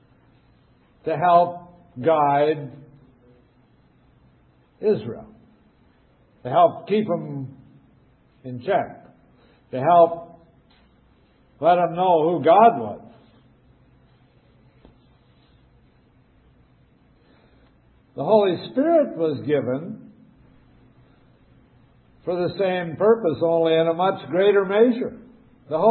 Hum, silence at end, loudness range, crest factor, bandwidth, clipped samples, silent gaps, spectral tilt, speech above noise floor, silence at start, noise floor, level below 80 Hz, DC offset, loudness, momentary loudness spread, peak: none; 0 s; 10 LU; 20 dB; 4.4 kHz; under 0.1%; none; -11 dB/octave; 38 dB; 1.05 s; -58 dBFS; -62 dBFS; under 0.1%; -20 LUFS; 19 LU; -4 dBFS